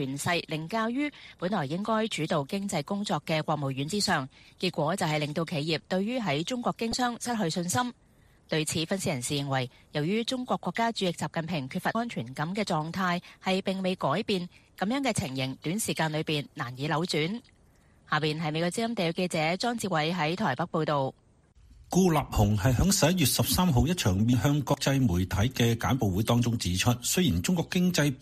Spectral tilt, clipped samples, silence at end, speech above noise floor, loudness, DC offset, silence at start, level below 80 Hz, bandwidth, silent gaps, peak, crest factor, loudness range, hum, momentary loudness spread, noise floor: -5 dB/octave; under 0.1%; 0 s; 32 dB; -28 LUFS; under 0.1%; 0 s; -48 dBFS; 15.5 kHz; none; -10 dBFS; 18 dB; 5 LU; none; 7 LU; -60 dBFS